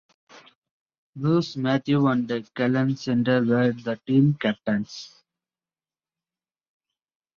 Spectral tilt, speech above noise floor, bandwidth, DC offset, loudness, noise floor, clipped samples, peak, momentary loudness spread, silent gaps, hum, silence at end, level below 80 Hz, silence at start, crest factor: -7.5 dB/octave; over 67 dB; 7 kHz; under 0.1%; -23 LUFS; under -90 dBFS; under 0.1%; -8 dBFS; 9 LU; 0.55-0.62 s, 0.71-0.86 s, 0.98-1.13 s; none; 2.3 s; -66 dBFS; 0.35 s; 18 dB